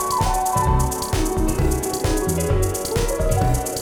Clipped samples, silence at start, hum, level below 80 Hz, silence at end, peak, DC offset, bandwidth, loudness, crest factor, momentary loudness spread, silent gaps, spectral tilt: under 0.1%; 0 s; none; -26 dBFS; 0 s; -6 dBFS; under 0.1%; 19.5 kHz; -21 LUFS; 14 dB; 3 LU; none; -5 dB/octave